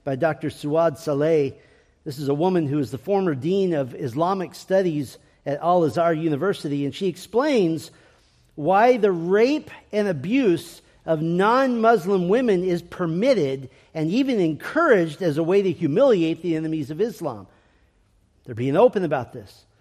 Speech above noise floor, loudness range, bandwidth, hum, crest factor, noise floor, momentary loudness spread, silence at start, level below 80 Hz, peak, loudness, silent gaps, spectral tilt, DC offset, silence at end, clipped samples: 40 dB; 3 LU; 14.5 kHz; none; 18 dB; -61 dBFS; 11 LU; 0.05 s; -62 dBFS; -4 dBFS; -22 LUFS; none; -7 dB/octave; under 0.1%; 0.35 s; under 0.1%